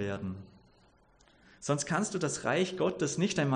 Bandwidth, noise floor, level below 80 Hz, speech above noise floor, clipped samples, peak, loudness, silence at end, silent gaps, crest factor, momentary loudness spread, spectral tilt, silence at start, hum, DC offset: 10 kHz; -64 dBFS; -66 dBFS; 33 dB; under 0.1%; -16 dBFS; -32 LUFS; 0 s; none; 18 dB; 11 LU; -4.5 dB/octave; 0 s; none; under 0.1%